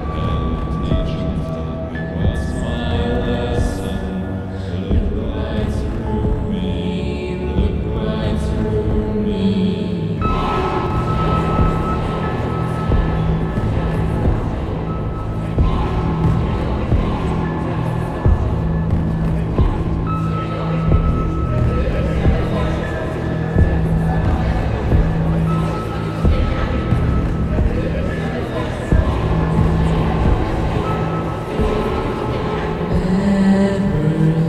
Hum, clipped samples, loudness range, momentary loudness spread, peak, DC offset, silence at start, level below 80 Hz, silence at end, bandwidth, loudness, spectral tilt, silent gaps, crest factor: none; under 0.1%; 3 LU; 5 LU; -2 dBFS; 0.1%; 0 s; -22 dBFS; 0 s; 11 kHz; -19 LUFS; -8.5 dB/octave; none; 16 dB